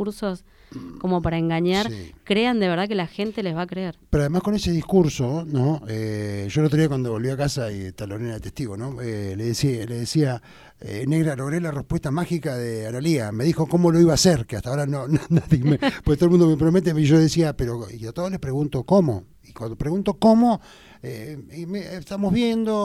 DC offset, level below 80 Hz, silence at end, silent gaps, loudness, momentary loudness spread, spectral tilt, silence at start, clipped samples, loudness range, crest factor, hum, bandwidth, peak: under 0.1%; -42 dBFS; 0 s; none; -22 LUFS; 15 LU; -6.5 dB/octave; 0 s; under 0.1%; 6 LU; 18 dB; none; 14 kHz; -4 dBFS